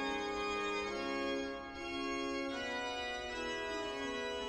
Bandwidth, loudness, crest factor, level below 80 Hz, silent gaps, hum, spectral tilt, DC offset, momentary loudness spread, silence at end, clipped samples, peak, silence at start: 12.5 kHz; -39 LUFS; 14 dB; -60 dBFS; none; none; -3 dB/octave; under 0.1%; 3 LU; 0 s; under 0.1%; -26 dBFS; 0 s